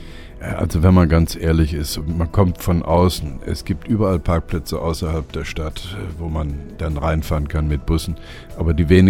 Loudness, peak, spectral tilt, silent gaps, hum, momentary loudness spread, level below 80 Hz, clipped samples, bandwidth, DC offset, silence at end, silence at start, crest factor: -20 LUFS; 0 dBFS; -7 dB/octave; none; none; 13 LU; -26 dBFS; under 0.1%; 16 kHz; under 0.1%; 0 s; 0 s; 18 dB